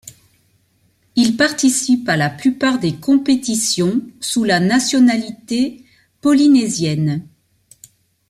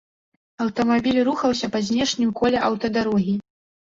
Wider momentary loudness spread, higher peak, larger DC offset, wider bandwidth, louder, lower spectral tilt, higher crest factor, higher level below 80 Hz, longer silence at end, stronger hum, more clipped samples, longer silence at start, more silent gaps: first, 9 LU vs 6 LU; first, -2 dBFS vs -8 dBFS; neither; first, 14.5 kHz vs 7.8 kHz; first, -16 LUFS vs -22 LUFS; about the same, -4 dB/octave vs -5 dB/octave; about the same, 14 dB vs 14 dB; about the same, -56 dBFS vs -52 dBFS; first, 1.05 s vs 0.5 s; neither; neither; second, 0.05 s vs 0.6 s; neither